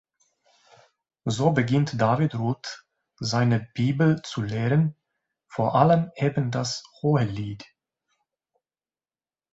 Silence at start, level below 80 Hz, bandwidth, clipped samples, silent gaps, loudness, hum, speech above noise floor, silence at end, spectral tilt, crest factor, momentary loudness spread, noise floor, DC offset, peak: 1.25 s; -58 dBFS; 8 kHz; under 0.1%; none; -24 LUFS; none; over 67 dB; 1.9 s; -6.5 dB/octave; 22 dB; 13 LU; under -90 dBFS; under 0.1%; -4 dBFS